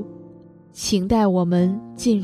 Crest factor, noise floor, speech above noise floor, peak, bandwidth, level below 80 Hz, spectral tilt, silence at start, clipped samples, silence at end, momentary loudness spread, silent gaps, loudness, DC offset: 14 dB; -45 dBFS; 26 dB; -8 dBFS; 14 kHz; -44 dBFS; -6 dB/octave; 0 s; under 0.1%; 0 s; 8 LU; none; -20 LUFS; under 0.1%